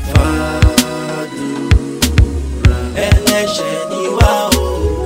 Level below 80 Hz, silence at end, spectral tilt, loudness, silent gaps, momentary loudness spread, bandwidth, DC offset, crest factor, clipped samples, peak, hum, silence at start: -18 dBFS; 0 s; -5 dB/octave; -14 LUFS; none; 8 LU; 16.5 kHz; under 0.1%; 14 dB; under 0.1%; 0 dBFS; none; 0 s